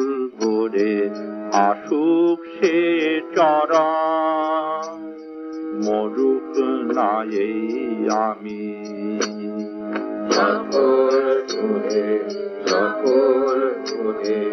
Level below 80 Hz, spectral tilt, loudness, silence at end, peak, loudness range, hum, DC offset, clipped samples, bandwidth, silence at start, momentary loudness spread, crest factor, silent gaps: -70 dBFS; -4.5 dB/octave; -20 LUFS; 0 s; -4 dBFS; 4 LU; none; under 0.1%; under 0.1%; 6.6 kHz; 0 s; 11 LU; 16 dB; none